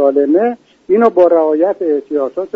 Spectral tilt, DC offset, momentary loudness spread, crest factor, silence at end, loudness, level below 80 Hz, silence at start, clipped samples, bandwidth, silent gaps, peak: -8.5 dB/octave; under 0.1%; 9 LU; 12 dB; 0.1 s; -13 LUFS; -60 dBFS; 0 s; under 0.1%; 5.6 kHz; none; 0 dBFS